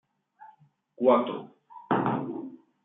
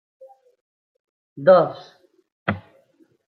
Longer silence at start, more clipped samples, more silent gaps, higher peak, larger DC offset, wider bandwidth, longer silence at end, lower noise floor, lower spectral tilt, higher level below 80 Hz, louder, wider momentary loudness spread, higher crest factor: second, 0.4 s vs 1.35 s; neither; second, none vs 2.32-2.46 s; second, -8 dBFS vs -2 dBFS; neither; second, 4 kHz vs 5.2 kHz; second, 0.3 s vs 0.7 s; about the same, -59 dBFS vs -60 dBFS; first, -10.5 dB/octave vs -8.5 dB/octave; second, -78 dBFS vs -66 dBFS; second, -27 LUFS vs -19 LUFS; about the same, 19 LU vs 18 LU; about the same, 22 dB vs 22 dB